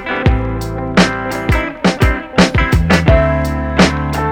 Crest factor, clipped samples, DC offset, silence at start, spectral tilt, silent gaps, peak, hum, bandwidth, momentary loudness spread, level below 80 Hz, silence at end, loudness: 14 dB; under 0.1%; under 0.1%; 0 s; -6 dB/octave; none; 0 dBFS; none; 17.5 kHz; 6 LU; -20 dBFS; 0 s; -14 LUFS